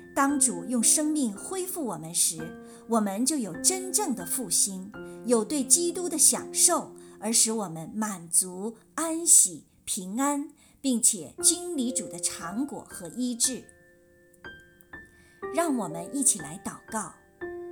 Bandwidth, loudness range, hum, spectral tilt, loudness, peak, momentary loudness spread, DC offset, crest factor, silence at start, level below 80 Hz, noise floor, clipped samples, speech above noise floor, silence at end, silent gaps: 19.5 kHz; 8 LU; none; -2 dB/octave; -25 LUFS; -4 dBFS; 17 LU; under 0.1%; 24 dB; 0 s; -66 dBFS; -58 dBFS; under 0.1%; 31 dB; 0 s; none